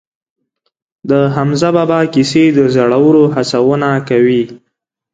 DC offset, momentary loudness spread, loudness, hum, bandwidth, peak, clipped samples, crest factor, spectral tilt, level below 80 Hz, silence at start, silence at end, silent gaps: under 0.1%; 5 LU; -11 LUFS; none; 9.2 kHz; 0 dBFS; under 0.1%; 12 dB; -6.5 dB/octave; -52 dBFS; 1.05 s; 0.55 s; none